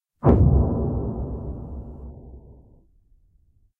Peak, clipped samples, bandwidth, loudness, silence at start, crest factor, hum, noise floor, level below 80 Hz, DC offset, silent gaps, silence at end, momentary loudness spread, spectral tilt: -4 dBFS; under 0.1%; 2.6 kHz; -22 LUFS; 0.25 s; 22 dB; none; -61 dBFS; -28 dBFS; under 0.1%; none; 1.3 s; 23 LU; -13 dB/octave